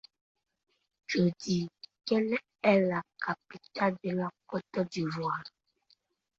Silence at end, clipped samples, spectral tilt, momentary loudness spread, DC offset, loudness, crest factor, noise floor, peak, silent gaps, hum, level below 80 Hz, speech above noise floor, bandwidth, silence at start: 0.9 s; under 0.1%; -6.5 dB/octave; 14 LU; under 0.1%; -32 LUFS; 22 dB; -71 dBFS; -10 dBFS; none; none; -72 dBFS; 40 dB; 7.8 kHz; 1.1 s